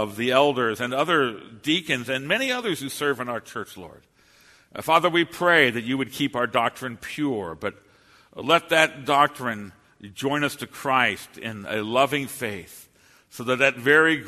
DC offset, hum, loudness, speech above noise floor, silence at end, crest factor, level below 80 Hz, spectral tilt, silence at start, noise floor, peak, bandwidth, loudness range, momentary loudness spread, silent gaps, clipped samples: under 0.1%; none; -23 LUFS; 32 dB; 0 s; 24 dB; -64 dBFS; -4 dB/octave; 0 s; -56 dBFS; 0 dBFS; 13.5 kHz; 3 LU; 15 LU; none; under 0.1%